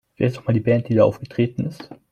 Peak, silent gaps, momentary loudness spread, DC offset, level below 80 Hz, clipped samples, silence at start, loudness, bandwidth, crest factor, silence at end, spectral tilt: -4 dBFS; none; 11 LU; under 0.1%; -54 dBFS; under 0.1%; 0.2 s; -21 LUFS; 8.4 kHz; 18 dB; 0.2 s; -9 dB/octave